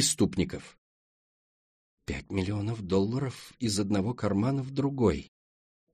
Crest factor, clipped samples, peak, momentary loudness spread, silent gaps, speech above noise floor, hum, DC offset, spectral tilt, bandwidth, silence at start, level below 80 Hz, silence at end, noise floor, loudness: 18 dB; under 0.1%; -12 dBFS; 11 LU; 0.78-1.98 s; over 61 dB; none; under 0.1%; -5 dB/octave; 13 kHz; 0 s; -52 dBFS; 0.7 s; under -90 dBFS; -30 LUFS